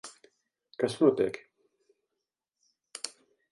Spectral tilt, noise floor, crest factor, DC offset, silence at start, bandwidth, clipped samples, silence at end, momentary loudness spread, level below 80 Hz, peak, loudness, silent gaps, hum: -5 dB/octave; -87 dBFS; 24 dB; under 0.1%; 0.05 s; 11.5 kHz; under 0.1%; 0.45 s; 23 LU; -74 dBFS; -10 dBFS; -30 LUFS; none; none